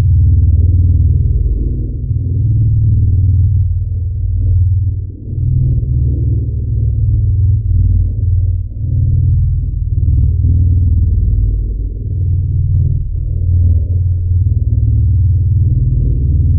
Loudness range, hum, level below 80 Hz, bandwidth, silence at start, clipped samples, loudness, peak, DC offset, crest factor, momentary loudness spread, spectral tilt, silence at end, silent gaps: 2 LU; none; -16 dBFS; 0.6 kHz; 0 s; under 0.1%; -14 LUFS; -2 dBFS; under 0.1%; 8 dB; 6 LU; -16.5 dB/octave; 0 s; none